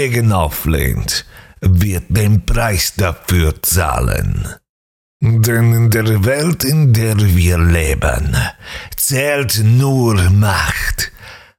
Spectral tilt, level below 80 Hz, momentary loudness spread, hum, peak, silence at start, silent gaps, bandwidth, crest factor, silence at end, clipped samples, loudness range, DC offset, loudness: -5 dB/octave; -24 dBFS; 7 LU; none; -4 dBFS; 0 s; 4.69-5.20 s; 18.5 kHz; 10 dB; 0.2 s; under 0.1%; 3 LU; under 0.1%; -14 LUFS